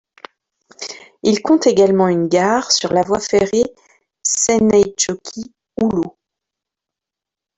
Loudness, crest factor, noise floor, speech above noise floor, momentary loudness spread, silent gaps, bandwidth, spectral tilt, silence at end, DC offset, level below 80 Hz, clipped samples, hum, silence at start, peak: -15 LUFS; 16 dB; -86 dBFS; 71 dB; 17 LU; none; 8.4 kHz; -4 dB/octave; 1.5 s; under 0.1%; -52 dBFS; under 0.1%; none; 0.8 s; -2 dBFS